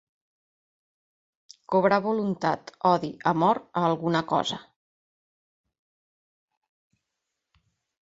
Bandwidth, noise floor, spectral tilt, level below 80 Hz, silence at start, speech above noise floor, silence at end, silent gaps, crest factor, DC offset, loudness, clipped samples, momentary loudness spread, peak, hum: 7.8 kHz; -84 dBFS; -6 dB/octave; -68 dBFS; 1.7 s; 59 dB; 3.5 s; none; 22 dB; under 0.1%; -25 LUFS; under 0.1%; 5 LU; -6 dBFS; none